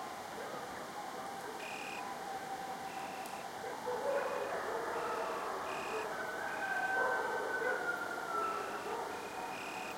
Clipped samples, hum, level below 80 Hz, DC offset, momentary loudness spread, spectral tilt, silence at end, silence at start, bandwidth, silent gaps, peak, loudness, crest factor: under 0.1%; none; -76 dBFS; under 0.1%; 8 LU; -2.5 dB/octave; 0 s; 0 s; 16.5 kHz; none; -22 dBFS; -39 LUFS; 16 dB